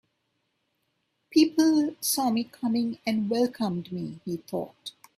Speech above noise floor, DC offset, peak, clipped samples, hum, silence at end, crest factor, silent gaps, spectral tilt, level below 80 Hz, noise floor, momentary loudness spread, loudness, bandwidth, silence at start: 50 dB; under 0.1%; -10 dBFS; under 0.1%; none; 0.3 s; 18 dB; none; -4.5 dB/octave; -70 dBFS; -76 dBFS; 13 LU; -27 LUFS; 15.5 kHz; 1.3 s